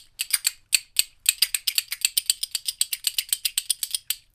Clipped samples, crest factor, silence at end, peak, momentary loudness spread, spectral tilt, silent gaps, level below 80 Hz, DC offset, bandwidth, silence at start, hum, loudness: under 0.1%; 26 dB; 0.15 s; 0 dBFS; 4 LU; 6 dB/octave; none; -64 dBFS; under 0.1%; 16 kHz; 0.2 s; none; -23 LUFS